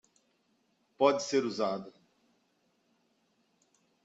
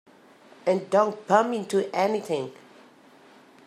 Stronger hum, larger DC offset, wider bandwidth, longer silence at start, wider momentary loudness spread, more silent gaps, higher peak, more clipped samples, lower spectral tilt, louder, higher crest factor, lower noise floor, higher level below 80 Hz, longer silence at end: neither; neither; second, 8 kHz vs 14.5 kHz; first, 1 s vs 0.65 s; about the same, 7 LU vs 9 LU; neither; second, -12 dBFS vs -6 dBFS; neither; second, -4 dB/octave vs -5.5 dB/octave; second, -31 LUFS vs -25 LUFS; about the same, 24 dB vs 22 dB; first, -74 dBFS vs -53 dBFS; about the same, -82 dBFS vs -82 dBFS; first, 2.15 s vs 1.15 s